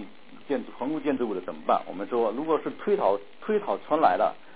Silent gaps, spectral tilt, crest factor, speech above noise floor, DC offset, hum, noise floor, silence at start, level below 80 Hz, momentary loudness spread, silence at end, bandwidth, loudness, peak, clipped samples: none; -9.5 dB/octave; 20 dB; 19 dB; 0.6%; none; -45 dBFS; 0 s; -70 dBFS; 9 LU; 0.2 s; 4 kHz; -27 LUFS; -6 dBFS; under 0.1%